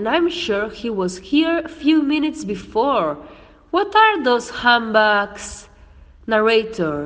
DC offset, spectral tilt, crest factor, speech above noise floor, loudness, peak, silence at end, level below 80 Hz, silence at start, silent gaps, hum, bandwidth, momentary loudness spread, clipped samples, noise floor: under 0.1%; -4.5 dB/octave; 18 dB; 27 dB; -18 LUFS; 0 dBFS; 0 s; -48 dBFS; 0 s; none; none; 9.6 kHz; 13 LU; under 0.1%; -45 dBFS